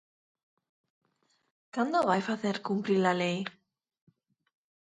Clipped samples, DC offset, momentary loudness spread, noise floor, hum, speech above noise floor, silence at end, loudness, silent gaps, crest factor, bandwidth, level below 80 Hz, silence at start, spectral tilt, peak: under 0.1%; under 0.1%; 10 LU; -74 dBFS; none; 45 dB; 1.45 s; -30 LUFS; none; 22 dB; 9.4 kHz; -78 dBFS; 1.75 s; -6 dB/octave; -12 dBFS